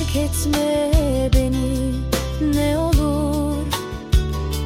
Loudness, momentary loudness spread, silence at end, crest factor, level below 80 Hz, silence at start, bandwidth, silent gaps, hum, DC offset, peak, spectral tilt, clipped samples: -20 LUFS; 5 LU; 0 s; 14 dB; -24 dBFS; 0 s; 16.5 kHz; none; none; under 0.1%; -4 dBFS; -6 dB/octave; under 0.1%